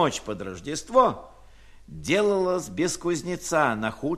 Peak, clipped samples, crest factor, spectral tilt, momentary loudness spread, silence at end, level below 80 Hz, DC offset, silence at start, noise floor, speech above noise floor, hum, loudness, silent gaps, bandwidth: -6 dBFS; under 0.1%; 20 dB; -4.5 dB/octave; 13 LU; 0 s; -52 dBFS; under 0.1%; 0 s; -49 dBFS; 24 dB; none; -25 LUFS; none; 14.5 kHz